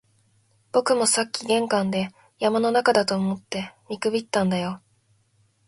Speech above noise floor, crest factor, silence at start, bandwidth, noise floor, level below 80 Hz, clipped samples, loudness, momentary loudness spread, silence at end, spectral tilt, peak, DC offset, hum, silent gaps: 42 dB; 22 dB; 0.75 s; 11.5 kHz; -64 dBFS; -66 dBFS; under 0.1%; -23 LUFS; 12 LU; 0.9 s; -4 dB/octave; -2 dBFS; under 0.1%; none; none